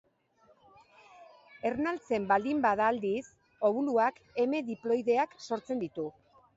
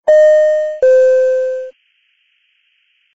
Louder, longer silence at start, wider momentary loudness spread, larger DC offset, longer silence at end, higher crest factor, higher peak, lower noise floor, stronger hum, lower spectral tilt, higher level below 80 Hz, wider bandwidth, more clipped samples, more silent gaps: second, -31 LUFS vs -11 LUFS; first, 1.2 s vs 0.05 s; second, 9 LU vs 14 LU; neither; second, 0.45 s vs 1.45 s; first, 18 dB vs 10 dB; second, -14 dBFS vs -2 dBFS; first, -66 dBFS vs -60 dBFS; neither; first, -6 dB/octave vs 1 dB/octave; second, -70 dBFS vs -62 dBFS; about the same, 7.8 kHz vs 7.8 kHz; neither; neither